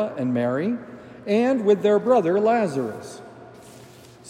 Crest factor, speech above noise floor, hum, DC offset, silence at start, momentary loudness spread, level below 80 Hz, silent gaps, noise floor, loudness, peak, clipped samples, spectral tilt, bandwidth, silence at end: 16 dB; 25 dB; none; under 0.1%; 0 s; 19 LU; -68 dBFS; none; -46 dBFS; -21 LUFS; -8 dBFS; under 0.1%; -7 dB/octave; 11.5 kHz; 0 s